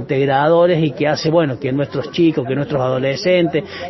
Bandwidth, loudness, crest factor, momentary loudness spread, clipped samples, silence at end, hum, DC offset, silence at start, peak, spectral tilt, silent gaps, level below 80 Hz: 6.2 kHz; -16 LUFS; 14 dB; 7 LU; under 0.1%; 0 s; none; under 0.1%; 0 s; -2 dBFS; -7 dB/octave; none; -50 dBFS